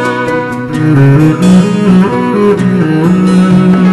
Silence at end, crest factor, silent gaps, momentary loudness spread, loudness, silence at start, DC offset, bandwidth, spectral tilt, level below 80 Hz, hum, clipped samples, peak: 0 s; 8 dB; none; 7 LU; -8 LUFS; 0 s; under 0.1%; 12 kHz; -8 dB/octave; -38 dBFS; none; 1%; 0 dBFS